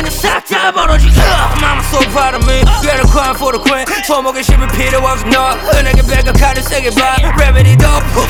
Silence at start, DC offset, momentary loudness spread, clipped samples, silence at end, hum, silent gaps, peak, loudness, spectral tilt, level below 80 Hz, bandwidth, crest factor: 0 s; under 0.1%; 4 LU; 0.4%; 0 s; none; none; 0 dBFS; -10 LUFS; -4.5 dB/octave; -12 dBFS; 19 kHz; 8 dB